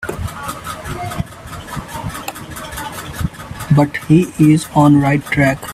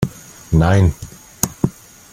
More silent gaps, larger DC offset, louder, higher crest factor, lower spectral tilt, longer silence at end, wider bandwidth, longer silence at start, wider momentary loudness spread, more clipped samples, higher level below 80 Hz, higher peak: neither; neither; about the same, -16 LUFS vs -18 LUFS; about the same, 16 dB vs 18 dB; about the same, -6.5 dB/octave vs -6 dB/octave; second, 0 s vs 0.45 s; about the same, 15.5 kHz vs 16.5 kHz; about the same, 0 s vs 0 s; second, 16 LU vs 21 LU; neither; second, -38 dBFS vs -32 dBFS; about the same, 0 dBFS vs 0 dBFS